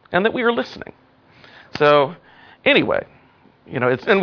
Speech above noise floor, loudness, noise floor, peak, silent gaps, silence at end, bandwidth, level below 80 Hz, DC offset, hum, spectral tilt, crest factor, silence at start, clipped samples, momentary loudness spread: 35 dB; -18 LUFS; -53 dBFS; -2 dBFS; none; 0 s; 5.4 kHz; -58 dBFS; under 0.1%; none; -6.5 dB/octave; 18 dB; 0.1 s; under 0.1%; 17 LU